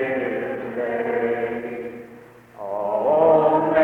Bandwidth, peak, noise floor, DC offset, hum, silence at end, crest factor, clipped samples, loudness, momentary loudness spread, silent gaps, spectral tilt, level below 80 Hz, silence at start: 4.1 kHz; -6 dBFS; -45 dBFS; under 0.1%; none; 0 s; 16 dB; under 0.1%; -21 LUFS; 17 LU; none; -8 dB/octave; -62 dBFS; 0 s